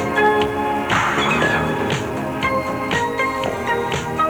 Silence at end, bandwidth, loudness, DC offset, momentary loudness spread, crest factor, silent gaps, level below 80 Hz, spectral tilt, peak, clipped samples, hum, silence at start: 0 s; over 20 kHz; -19 LUFS; under 0.1%; 5 LU; 14 dB; none; -42 dBFS; -4.5 dB/octave; -6 dBFS; under 0.1%; none; 0 s